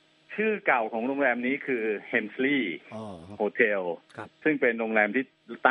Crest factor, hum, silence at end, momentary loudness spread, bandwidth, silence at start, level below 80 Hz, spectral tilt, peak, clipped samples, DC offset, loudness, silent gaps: 22 dB; none; 0 s; 15 LU; 9.6 kHz; 0.3 s; -76 dBFS; -7 dB/octave; -6 dBFS; under 0.1%; under 0.1%; -27 LUFS; none